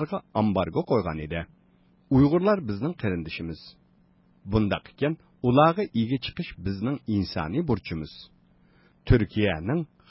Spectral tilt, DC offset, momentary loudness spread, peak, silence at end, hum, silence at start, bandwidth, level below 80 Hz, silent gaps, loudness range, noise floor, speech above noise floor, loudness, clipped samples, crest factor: -11.5 dB/octave; under 0.1%; 14 LU; -6 dBFS; 0.25 s; none; 0 s; 5.8 kHz; -42 dBFS; none; 3 LU; -61 dBFS; 36 dB; -26 LUFS; under 0.1%; 20 dB